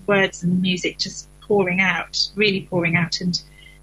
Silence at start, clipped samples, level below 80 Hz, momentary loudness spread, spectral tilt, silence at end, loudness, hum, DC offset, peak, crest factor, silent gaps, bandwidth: 0.1 s; under 0.1%; -50 dBFS; 8 LU; -4.5 dB/octave; 0.4 s; -20 LUFS; none; under 0.1%; -6 dBFS; 16 dB; none; 11 kHz